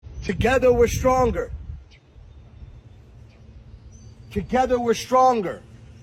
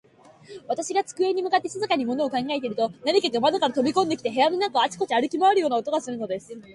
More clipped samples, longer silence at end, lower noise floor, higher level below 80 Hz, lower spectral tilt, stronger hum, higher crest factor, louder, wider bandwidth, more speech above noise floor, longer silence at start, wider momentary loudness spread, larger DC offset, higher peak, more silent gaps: neither; about the same, 0.05 s vs 0 s; about the same, -47 dBFS vs -49 dBFS; first, -38 dBFS vs -70 dBFS; first, -5.5 dB/octave vs -3.5 dB/octave; neither; about the same, 16 dB vs 16 dB; first, -21 LUFS vs -24 LUFS; first, 16 kHz vs 11.5 kHz; about the same, 27 dB vs 25 dB; second, 0.05 s vs 0.5 s; first, 19 LU vs 9 LU; neither; about the same, -8 dBFS vs -8 dBFS; neither